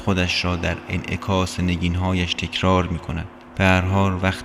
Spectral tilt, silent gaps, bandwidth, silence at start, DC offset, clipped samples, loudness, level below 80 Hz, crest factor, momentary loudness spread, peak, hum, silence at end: -5.5 dB/octave; none; 13 kHz; 0 s; under 0.1%; under 0.1%; -21 LUFS; -38 dBFS; 20 dB; 9 LU; -2 dBFS; none; 0 s